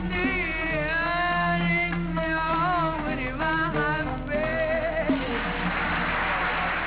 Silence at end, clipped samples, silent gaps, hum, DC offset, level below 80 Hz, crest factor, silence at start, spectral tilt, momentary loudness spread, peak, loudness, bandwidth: 0 s; under 0.1%; none; none; 0.2%; -38 dBFS; 14 dB; 0 s; -3.5 dB/octave; 4 LU; -12 dBFS; -25 LUFS; 4 kHz